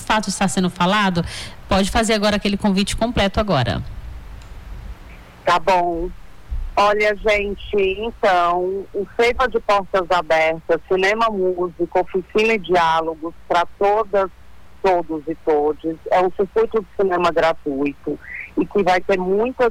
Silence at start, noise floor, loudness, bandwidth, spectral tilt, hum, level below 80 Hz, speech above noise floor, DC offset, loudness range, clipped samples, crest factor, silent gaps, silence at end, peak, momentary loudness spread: 0 s; -40 dBFS; -19 LUFS; 16 kHz; -5 dB/octave; none; -36 dBFS; 21 dB; under 0.1%; 3 LU; under 0.1%; 10 dB; none; 0 s; -8 dBFS; 11 LU